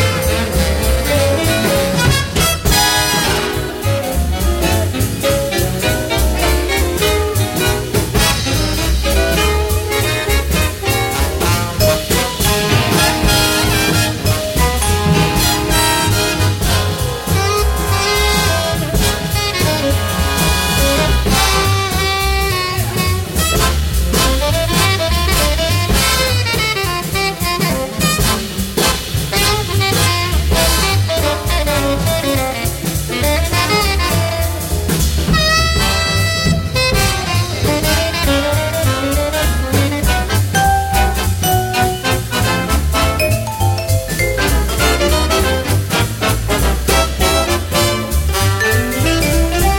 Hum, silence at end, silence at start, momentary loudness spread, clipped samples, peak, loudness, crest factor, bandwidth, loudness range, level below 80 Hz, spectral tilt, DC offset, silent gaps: none; 0 s; 0 s; 4 LU; under 0.1%; 0 dBFS; -14 LUFS; 14 dB; 17 kHz; 2 LU; -22 dBFS; -4 dB/octave; under 0.1%; none